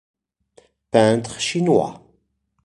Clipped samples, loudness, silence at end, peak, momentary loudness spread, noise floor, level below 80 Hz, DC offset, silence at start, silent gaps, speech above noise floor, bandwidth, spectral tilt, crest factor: under 0.1%; -19 LUFS; 0.7 s; -2 dBFS; 7 LU; -67 dBFS; -58 dBFS; under 0.1%; 0.95 s; none; 50 dB; 11.5 kHz; -5 dB/octave; 20 dB